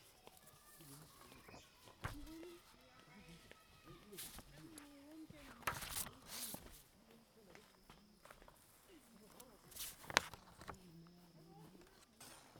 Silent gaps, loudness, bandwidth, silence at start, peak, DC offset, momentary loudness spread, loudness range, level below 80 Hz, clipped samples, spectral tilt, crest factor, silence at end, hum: none; -49 LUFS; over 20 kHz; 0 s; -8 dBFS; under 0.1%; 19 LU; 10 LU; -68 dBFS; under 0.1%; -2 dB/octave; 44 dB; 0 s; none